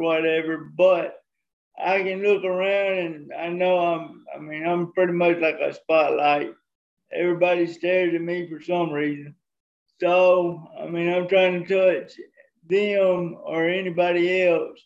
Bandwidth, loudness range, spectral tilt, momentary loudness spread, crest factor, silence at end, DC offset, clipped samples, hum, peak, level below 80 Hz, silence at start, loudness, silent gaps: 7.6 kHz; 2 LU; -7 dB/octave; 11 LU; 16 dB; 0.1 s; under 0.1%; under 0.1%; none; -6 dBFS; -74 dBFS; 0 s; -22 LUFS; 1.53-1.71 s, 6.75-6.97 s, 9.60-9.86 s